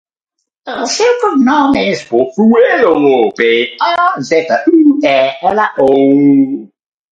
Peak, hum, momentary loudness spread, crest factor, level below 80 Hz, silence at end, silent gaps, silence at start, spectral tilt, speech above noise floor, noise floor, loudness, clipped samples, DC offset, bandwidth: 0 dBFS; none; 6 LU; 10 dB; -52 dBFS; 0.45 s; none; 0.65 s; -4.5 dB/octave; 63 dB; -73 dBFS; -10 LUFS; under 0.1%; under 0.1%; 8.8 kHz